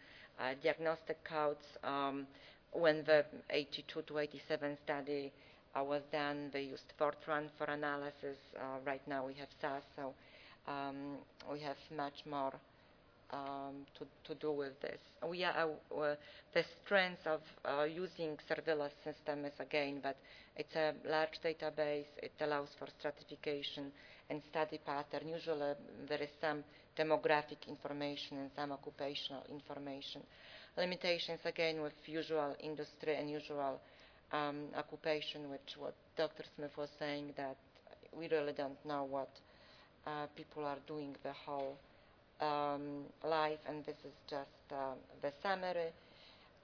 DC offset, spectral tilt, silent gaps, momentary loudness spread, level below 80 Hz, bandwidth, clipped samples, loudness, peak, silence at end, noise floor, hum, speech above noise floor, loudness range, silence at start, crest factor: under 0.1%; -2.5 dB/octave; none; 12 LU; -76 dBFS; 5.4 kHz; under 0.1%; -42 LUFS; -18 dBFS; 0.05 s; -66 dBFS; none; 25 dB; 7 LU; 0 s; 24 dB